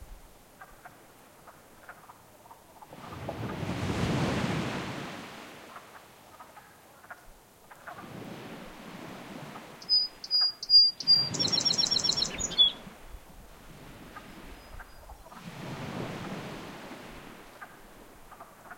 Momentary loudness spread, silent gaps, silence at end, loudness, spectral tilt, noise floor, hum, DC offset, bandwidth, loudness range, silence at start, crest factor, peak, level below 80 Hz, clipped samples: 27 LU; none; 0 s; -25 LUFS; -2.5 dB/octave; -55 dBFS; none; under 0.1%; 16.5 kHz; 23 LU; 0 s; 22 dB; -10 dBFS; -56 dBFS; under 0.1%